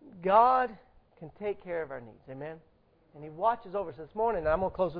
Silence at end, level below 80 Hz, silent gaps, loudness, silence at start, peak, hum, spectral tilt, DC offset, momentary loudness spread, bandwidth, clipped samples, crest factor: 0 s; -54 dBFS; none; -29 LUFS; 0.05 s; -10 dBFS; none; -9.5 dB/octave; under 0.1%; 24 LU; 5 kHz; under 0.1%; 22 dB